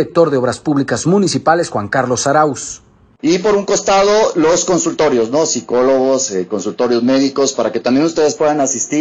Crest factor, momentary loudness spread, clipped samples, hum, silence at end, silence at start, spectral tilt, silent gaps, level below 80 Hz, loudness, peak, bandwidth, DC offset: 14 dB; 5 LU; under 0.1%; none; 0 s; 0 s; -4 dB/octave; none; -50 dBFS; -14 LUFS; 0 dBFS; 9.8 kHz; under 0.1%